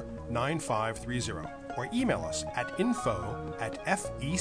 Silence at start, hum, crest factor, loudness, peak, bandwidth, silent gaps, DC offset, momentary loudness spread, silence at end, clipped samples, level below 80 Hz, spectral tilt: 0 s; none; 20 dB; -33 LUFS; -12 dBFS; 11 kHz; none; under 0.1%; 7 LU; 0 s; under 0.1%; -50 dBFS; -5 dB/octave